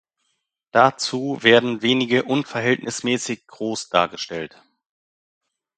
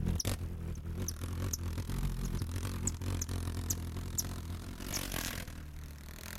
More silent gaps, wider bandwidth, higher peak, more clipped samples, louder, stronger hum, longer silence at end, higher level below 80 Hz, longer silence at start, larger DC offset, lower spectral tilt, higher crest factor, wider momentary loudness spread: neither; second, 9.4 kHz vs 17 kHz; first, 0 dBFS vs -18 dBFS; neither; first, -20 LUFS vs -39 LUFS; neither; first, 1.3 s vs 0 s; second, -64 dBFS vs -42 dBFS; first, 0.75 s vs 0 s; neither; about the same, -4 dB/octave vs -4 dB/octave; about the same, 22 dB vs 20 dB; first, 14 LU vs 8 LU